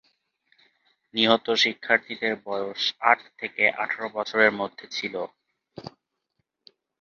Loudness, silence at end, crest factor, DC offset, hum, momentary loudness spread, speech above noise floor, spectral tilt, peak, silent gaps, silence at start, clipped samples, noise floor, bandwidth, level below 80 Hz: -24 LUFS; 1.15 s; 26 dB; under 0.1%; none; 14 LU; 53 dB; -3 dB/octave; -2 dBFS; none; 1.15 s; under 0.1%; -78 dBFS; 7.4 kHz; -72 dBFS